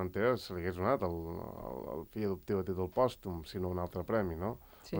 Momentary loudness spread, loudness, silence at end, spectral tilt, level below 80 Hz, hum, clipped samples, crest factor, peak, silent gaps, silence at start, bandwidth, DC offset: 10 LU; -36 LUFS; 0 s; -7.5 dB/octave; -58 dBFS; none; under 0.1%; 20 dB; -16 dBFS; none; 0 s; over 20 kHz; under 0.1%